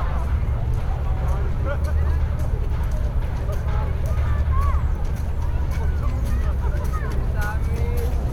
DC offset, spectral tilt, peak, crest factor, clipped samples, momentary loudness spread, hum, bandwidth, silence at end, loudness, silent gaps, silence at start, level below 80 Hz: under 0.1%; -7.5 dB/octave; -8 dBFS; 12 dB; under 0.1%; 3 LU; none; 13.5 kHz; 0 s; -24 LUFS; none; 0 s; -22 dBFS